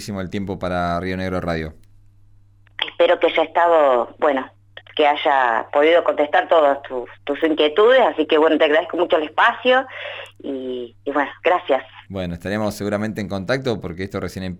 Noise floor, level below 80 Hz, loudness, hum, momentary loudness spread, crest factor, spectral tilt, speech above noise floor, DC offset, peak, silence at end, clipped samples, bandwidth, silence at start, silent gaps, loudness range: -50 dBFS; -50 dBFS; -19 LUFS; none; 14 LU; 14 dB; -5.5 dB/octave; 31 dB; under 0.1%; -4 dBFS; 0 s; under 0.1%; 15 kHz; 0 s; none; 6 LU